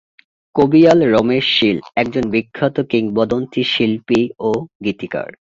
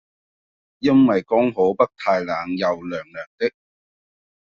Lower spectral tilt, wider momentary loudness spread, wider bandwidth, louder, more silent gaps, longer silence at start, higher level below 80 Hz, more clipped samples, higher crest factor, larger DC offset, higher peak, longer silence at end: first, -6.5 dB/octave vs -5 dB/octave; about the same, 11 LU vs 12 LU; first, 7.6 kHz vs 6.8 kHz; first, -16 LUFS vs -20 LUFS; second, 4.75-4.80 s vs 3.27-3.38 s; second, 0.55 s vs 0.8 s; first, -50 dBFS vs -60 dBFS; neither; about the same, 16 dB vs 18 dB; neither; first, 0 dBFS vs -4 dBFS; second, 0.2 s vs 0.95 s